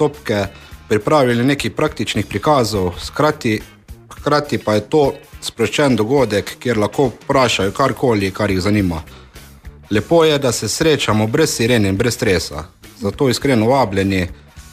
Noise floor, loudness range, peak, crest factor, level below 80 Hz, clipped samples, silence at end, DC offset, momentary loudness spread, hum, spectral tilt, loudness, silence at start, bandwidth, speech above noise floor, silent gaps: -38 dBFS; 2 LU; -2 dBFS; 14 dB; -40 dBFS; under 0.1%; 0.1 s; under 0.1%; 7 LU; none; -5 dB/octave; -16 LUFS; 0 s; 15.5 kHz; 22 dB; none